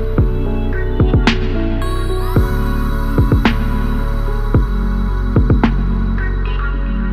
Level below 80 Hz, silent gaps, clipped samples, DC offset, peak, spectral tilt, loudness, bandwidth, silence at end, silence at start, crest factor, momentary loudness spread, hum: -16 dBFS; none; under 0.1%; under 0.1%; 0 dBFS; -7.5 dB/octave; -17 LUFS; 14 kHz; 0 s; 0 s; 14 dB; 6 LU; none